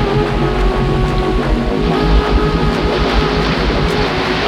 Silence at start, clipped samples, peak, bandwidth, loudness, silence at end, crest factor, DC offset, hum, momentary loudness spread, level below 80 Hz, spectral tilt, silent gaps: 0 s; under 0.1%; -2 dBFS; 11.5 kHz; -15 LUFS; 0 s; 12 dB; under 0.1%; none; 2 LU; -18 dBFS; -6.5 dB/octave; none